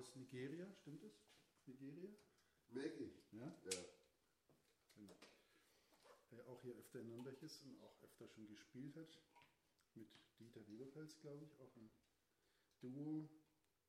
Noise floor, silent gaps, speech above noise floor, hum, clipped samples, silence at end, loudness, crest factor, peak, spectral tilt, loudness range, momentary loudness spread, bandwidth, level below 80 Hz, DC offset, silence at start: -85 dBFS; none; 28 dB; none; under 0.1%; 0.45 s; -57 LUFS; 28 dB; -30 dBFS; -4.5 dB/octave; 7 LU; 16 LU; 15.5 kHz; under -90 dBFS; under 0.1%; 0 s